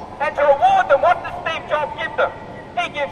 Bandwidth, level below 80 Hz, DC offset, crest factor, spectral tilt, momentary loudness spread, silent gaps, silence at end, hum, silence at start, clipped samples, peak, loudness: 10 kHz; -48 dBFS; under 0.1%; 16 dB; -4.5 dB/octave; 10 LU; none; 0 s; none; 0 s; under 0.1%; -4 dBFS; -18 LUFS